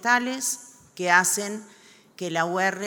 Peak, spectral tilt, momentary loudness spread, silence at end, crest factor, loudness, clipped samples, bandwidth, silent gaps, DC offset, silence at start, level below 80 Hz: -4 dBFS; -2 dB/octave; 16 LU; 0 s; 22 dB; -24 LUFS; under 0.1%; 19.5 kHz; none; under 0.1%; 0 s; -78 dBFS